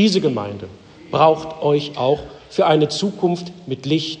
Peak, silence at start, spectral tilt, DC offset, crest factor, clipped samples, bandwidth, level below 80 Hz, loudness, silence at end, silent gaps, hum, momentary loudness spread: -2 dBFS; 0 s; -6 dB/octave; under 0.1%; 18 dB; under 0.1%; 9.6 kHz; -54 dBFS; -19 LUFS; 0 s; none; none; 13 LU